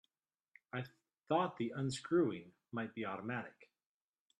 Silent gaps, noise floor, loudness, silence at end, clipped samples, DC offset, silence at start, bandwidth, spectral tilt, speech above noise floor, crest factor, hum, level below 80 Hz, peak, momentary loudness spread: none; under -90 dBFS; -40 LUFS; 0.75 s; under 0.1%; under 0.1%; 0.75 s; 11.5 kHz; -6 dB/octave; over 51 dB; 20 dB; none; -80 dBFS; -22 dBFS; 13 LU